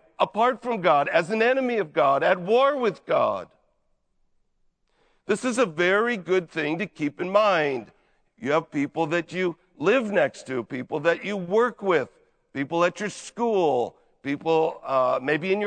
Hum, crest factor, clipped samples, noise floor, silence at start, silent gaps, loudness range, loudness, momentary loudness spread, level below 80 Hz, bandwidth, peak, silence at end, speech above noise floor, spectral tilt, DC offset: none; 20 dB; under 0.1%; -69 dBFS; 0.2 s; none; 4 LU; -24 LUFS; 10 LU; -70 dBFS; 9.4 kHz; -6 dBFS; 0 s; 46 dB; -5 dB/octave; under 0.1%